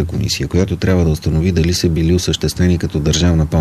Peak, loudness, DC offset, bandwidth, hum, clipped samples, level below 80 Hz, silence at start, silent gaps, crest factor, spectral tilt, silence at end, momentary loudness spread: -2 dBFS; -15 LUFS; 0.2%; 14 kHz; none; under 0.1%; -26 dBFS; 0 s; none; 12 dB; -5.5 dB/octave; 0 s; 3 LU